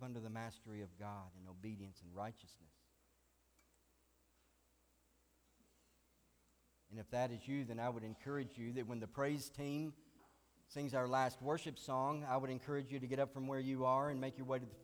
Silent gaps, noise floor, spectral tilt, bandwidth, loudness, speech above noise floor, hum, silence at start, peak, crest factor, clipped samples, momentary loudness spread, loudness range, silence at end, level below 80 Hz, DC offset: none; -77 dBFS; -6.5 dB/octave; over 20 kHz; -43 LUFS; 34 dB; none; 0 s; -26 dBFS; 20 dB; under 0.1%; 14 LU; 15 LU; 0 s; -76 dBFS; under 0.1%